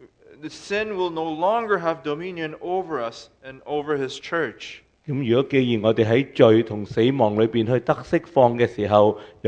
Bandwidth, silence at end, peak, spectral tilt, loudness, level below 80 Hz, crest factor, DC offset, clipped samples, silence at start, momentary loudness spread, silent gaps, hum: 9 kHz; 0 s; 0 dBFS; -7 dB/octave; -22 LUFS; -58 dBFS; 22 dB; under 0.1%; under 0.1%; 0.45 s; 15 LU; none; none